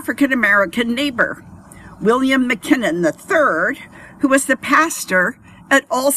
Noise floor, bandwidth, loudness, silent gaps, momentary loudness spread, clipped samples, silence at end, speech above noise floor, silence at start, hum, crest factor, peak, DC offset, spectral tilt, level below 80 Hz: -39 dBFS; 15 kHz; -16 LUFS; none; 7 LU; under 0.1%; 0 s; 23 dB; 0 s; none; 16 dB; 0 dBFS; under 0.1%; -3.5 dB/octave; -54 dBFS